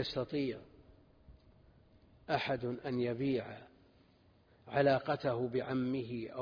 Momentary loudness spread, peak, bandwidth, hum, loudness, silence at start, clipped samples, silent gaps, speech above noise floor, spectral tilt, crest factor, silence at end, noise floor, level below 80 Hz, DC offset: 10 LU; -18 dBFS; 5.2 kHz; none; -36 LUFS; 0 s; under 0.1%; none; 31 dB; -5 dB/octave; 20 dB; 0 s; -67 dBFS; -66 dBFS; under 0.1%